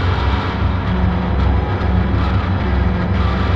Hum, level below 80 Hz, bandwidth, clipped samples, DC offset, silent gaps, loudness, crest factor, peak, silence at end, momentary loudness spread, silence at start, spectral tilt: none; -20 dBFS; 6 kHz; under 0.1%; under 0.1%; none; -18 LUFS; 12 dB; -4 dBFS; 0 s; 1 LU; 0 s; -8.5 dB/octave